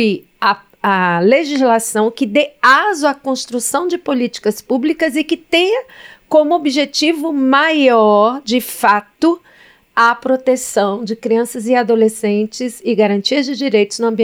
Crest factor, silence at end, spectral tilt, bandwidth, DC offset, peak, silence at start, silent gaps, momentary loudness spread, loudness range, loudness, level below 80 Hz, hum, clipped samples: 14 dB; 0 s; -4 dB/octave; 17 kHz; under 0.1%; 0 dBFS; 0 s; none; 7 LU; 3 LU; -14 LUFS; -60 dBFS; none; under 0.1%